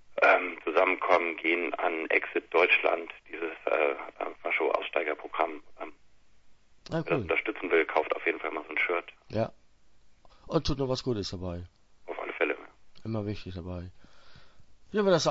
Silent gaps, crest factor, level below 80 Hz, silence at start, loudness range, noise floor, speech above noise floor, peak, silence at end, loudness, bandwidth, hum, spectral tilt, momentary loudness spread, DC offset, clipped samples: none; 22 dB; -54 dBFS; 0.1 s; 8 LU; -55 dBFS; 26 dB; -8 dBFS; 0 s; -29 LUFS; 8 kHz; none; -5 dB/octave; 15 LU; under 0.1%; under 0.1%